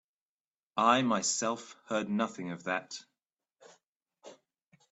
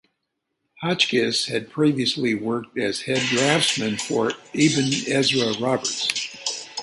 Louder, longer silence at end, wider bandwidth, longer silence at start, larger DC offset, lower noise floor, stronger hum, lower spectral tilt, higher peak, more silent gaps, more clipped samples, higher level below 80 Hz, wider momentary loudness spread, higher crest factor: second, -31 LUFS vs -22 LUFS; first, 0.6 s vs 0 s; second, 8.4 kHz vs 11.5 kHz; about the same, 0.75 s vs 0.8 s; neither; first, under -90 dBFS vs -78 dBFS; neither; about the same, -3 dB/octave vs -3.5 dB/octave; second, -12 dBFS vs -2 dBFS; first, 3.86-4.06 s vs none; neither; second, -78 dBFS vs -64 dBFS; first, 14 LU vs 7 LU; about the same, 22 dB vs 22 dB